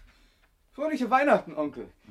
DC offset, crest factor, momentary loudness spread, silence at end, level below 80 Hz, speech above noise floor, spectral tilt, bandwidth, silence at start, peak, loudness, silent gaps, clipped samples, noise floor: under 0.1%; 20 dB; 12 LU; 0.2 s; -62 dBFS; 37 dB; -6 dB/octave; 13 kHz; 0.8 s; -8 dBFS; -26 LUFS; none; under 0.1%; -64 dBFS